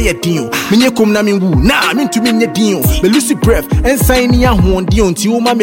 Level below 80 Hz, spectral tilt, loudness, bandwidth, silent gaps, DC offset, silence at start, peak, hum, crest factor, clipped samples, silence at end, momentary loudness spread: -20 dBFS; -5 dB/octave; -11 LUFS; 17 kHz; none; 0.2%; 0 s; 0 dBFS; none; 10 dB; under 0.1%; 0 s; 3 LU